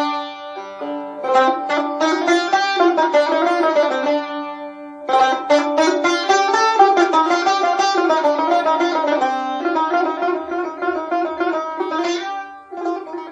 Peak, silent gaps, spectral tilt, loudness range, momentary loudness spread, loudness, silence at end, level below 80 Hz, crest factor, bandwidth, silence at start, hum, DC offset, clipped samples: 0 dBFS; none; -2 dB/octave; 5 LU; 12 LU; -18 LUFS; 0 s; -70 dBFS; 18 dB; 9.8 kHz; 0 s; none; under 0.1%; under 0.1%